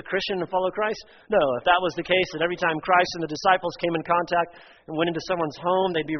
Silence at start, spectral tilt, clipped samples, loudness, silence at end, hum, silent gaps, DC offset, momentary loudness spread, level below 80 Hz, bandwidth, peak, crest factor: 0.05 s; -2.5 dB/octave; under 0.1%; -24 LUFS; 0 s; none; none; under 0.1%; 6 LU; -58 dBFS; 6.4 kHz; -4 dBFS; 20 dB